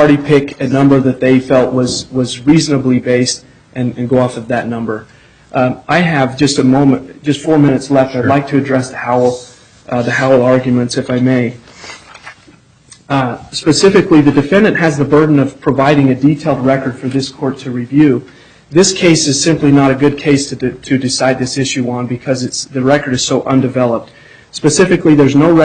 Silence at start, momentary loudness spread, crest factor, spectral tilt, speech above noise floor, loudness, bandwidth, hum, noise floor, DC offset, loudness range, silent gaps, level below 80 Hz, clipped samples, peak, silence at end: 0 s; 10 LU; 12 dB; -5.5 dB/octave; 33 dB; -12 LUFS; 9.4 kHz; none; -44 dBFS; under 0.1%; 4 LU; none; -44 dBFS; under 0.1%; 0 dBFS; 0 s